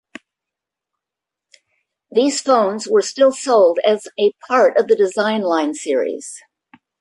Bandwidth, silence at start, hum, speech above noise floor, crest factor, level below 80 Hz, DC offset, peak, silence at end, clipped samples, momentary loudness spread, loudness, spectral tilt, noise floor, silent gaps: 11.5 kHz; 2.1 s; none; 69 dB; 16 dB; -70 dBFS; under 0.1%; -2 dBFS; 0.6 s; under 0.1%; 7 LU; -16 LUFS; -3.5 dB/octave; -85 dBFS; none